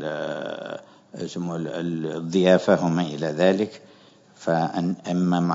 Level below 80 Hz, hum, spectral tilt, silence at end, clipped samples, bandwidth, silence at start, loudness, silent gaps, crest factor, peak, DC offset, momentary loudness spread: -70 dBFS; none; -6.5 dB/octave; 0 s; under 0.1%; 7.8 kHz; 0 s; -24 LUFS; none; 20 dB; -4 dBFS; under 0.1%; 15 LU